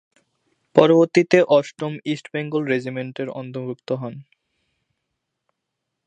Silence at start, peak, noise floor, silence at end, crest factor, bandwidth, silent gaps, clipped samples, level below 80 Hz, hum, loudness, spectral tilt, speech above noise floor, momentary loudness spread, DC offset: 0.75 s; 0 dBFS; -80 dBFS; 1.85 s; 22 dB; 9.4 kHz; none; under 0.1%; -68 dBFS; none; -20 LUFS; -6.5 dB/octave; 60 dB; 15 LU; under 0.1%